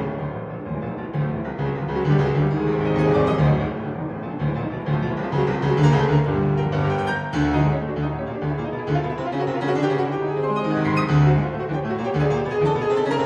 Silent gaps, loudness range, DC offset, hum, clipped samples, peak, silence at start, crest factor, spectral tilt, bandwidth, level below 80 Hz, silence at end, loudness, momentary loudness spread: none; 2 LU; under 0.1%; none; under 0.1%; -6 dBFS; 0 s; 16 dB; -8.5 dB/octave; 7.2 kHz; -40 dBFS; 0 s; -22 LUFS; 9 LU